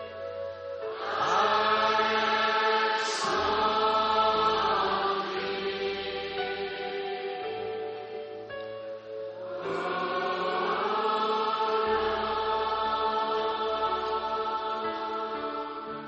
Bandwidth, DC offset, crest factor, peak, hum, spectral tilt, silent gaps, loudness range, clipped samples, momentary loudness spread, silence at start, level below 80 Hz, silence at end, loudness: 7.4 kHz; under 0.1%; 16 dB; -12 dBFS; none; -0.5 dB/octave; none; 9 LU; under 0.1%; 13 LU; 0 s; -60 dBFS; 0 s; -28 LUFS